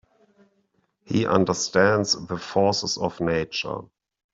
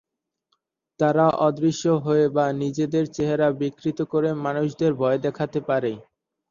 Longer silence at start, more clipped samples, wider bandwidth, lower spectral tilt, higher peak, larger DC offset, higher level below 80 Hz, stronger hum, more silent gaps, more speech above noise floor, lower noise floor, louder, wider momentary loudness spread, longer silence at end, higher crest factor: about the same, 1.1 s vs 1 s; neither; about the same, 8 kHz vs 7.4 kHz; second, -4 dB/octave vs -7 dB/octave; about the same, -4 dBFS vs -6 dBFS; neither; about the same, -58 dBFS vs -60 dBFS; neither; neither; second, 46 dB vs 52 dB; second, -69 dBFS vs -74 dBFS; about the same, -23 LUFS vs -23 LUFS; about the same, 9 LU vs 7 LU; about the same, 0.5 s vs 0.5 s; about the same, 22 dB vs 18 dB